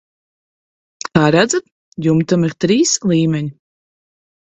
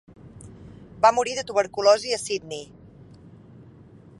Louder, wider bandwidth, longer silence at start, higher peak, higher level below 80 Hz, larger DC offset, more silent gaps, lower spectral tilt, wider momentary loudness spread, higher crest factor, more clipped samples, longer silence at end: first, -15 LUFS vs -22 LUFS; second, 8.2 kHz vs 11.5 kHz; first, 1.05 s vs 0.25 s; first, 0 dBFS vs -4 dBFS; about the same, -54 dBFS vs -58 dBFS; neither; first, 1.71-1.92 s vs none; first, -5 dB/octave vs -2.5 dB/octave; second, 11 LU vs 25 LU; about the same, 18 dB vs 22 dB; neither; second, 1 s vs 1.55 s